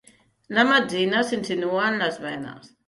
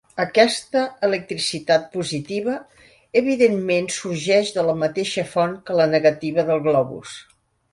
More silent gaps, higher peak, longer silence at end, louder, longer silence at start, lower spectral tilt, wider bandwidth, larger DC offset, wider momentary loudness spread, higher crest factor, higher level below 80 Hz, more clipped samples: neither; second, -6 dBFS vs -2 dBFS; second, 0.2 s vs 0.5 s; about the same, -22 LUFS vs -20 LUFS; first, 0.5 s vs 0.15 s; about the same, -4.5 dB/octave vs -4.5 dB/octave; about the same, 11.5 kHz vs 11.5 kHz; neither; first, 14 LU vs 9 LU; about the same, 18 dB vs 18 dB; about the same, -66 dBFS vs -62 dBFS; neither